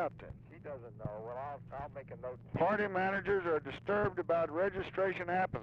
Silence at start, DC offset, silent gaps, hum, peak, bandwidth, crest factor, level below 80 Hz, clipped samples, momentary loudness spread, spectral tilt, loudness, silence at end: 0 s; under 0.1%; none; none; -22 dBFS; 7 kHz; 14 dB; -60 dBFS; under 0.1%; 15 LU; -8 dB/octave; -36 LUFS; 0 s